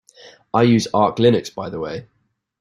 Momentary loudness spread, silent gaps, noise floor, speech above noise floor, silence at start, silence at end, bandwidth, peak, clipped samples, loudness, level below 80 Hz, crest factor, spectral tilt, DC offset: 13 LU; none; -47 dBFS; 30 dB; 0.25 s; 0.6 s; 12 kHz; -2 dBFS; under 0.1%; -18 LUFS; -56 dBFS; 18 dB; -6.5 dB/octave; under 0.1%